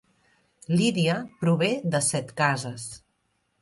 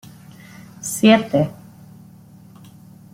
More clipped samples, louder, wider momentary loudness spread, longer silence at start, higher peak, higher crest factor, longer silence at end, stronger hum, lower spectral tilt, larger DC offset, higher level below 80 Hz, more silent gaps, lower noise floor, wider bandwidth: neither; second, -25 LUFS vs -17 LUFS; second, 13 LU vs 26 LU; about the same, 0.7 s vs 0.8 s; second, -8 dBFS vs -2 dBFS; about the same, 18 dB vs 20 dB; second, 0.65 s vs 1.6 s; neither; about the same, -4.5 dB/octave vs -5 dB/octave; neither; about the same, -64 dBFS vs -60 dBFS; neither; first, -73 dBFS vs -44 dBFS; second, 11.5 kHz vs 16.5 kHz